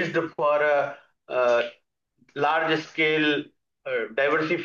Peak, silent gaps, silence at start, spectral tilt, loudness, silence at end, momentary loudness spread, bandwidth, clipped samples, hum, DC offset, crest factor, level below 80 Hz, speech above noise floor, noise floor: -10 dBFS; none; 0 s; -5.5 dB/octave; -24 LUFS; 0 s; 10 LU; 7.2 kHz; under 0.1%; none; under 0.1%; 14 dB; -78 dBFS; 42 dB; -65 dBFS